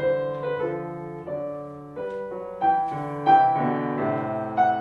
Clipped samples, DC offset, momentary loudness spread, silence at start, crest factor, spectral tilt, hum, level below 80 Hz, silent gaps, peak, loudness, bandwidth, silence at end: under 0.1%; under 0.1%; 16 LU; 0 s; 18 dB; -8.5 dB/octave; none; -62 dBFS; none; -6 dBFS; -25 LUFS; 5 kHz; 0 s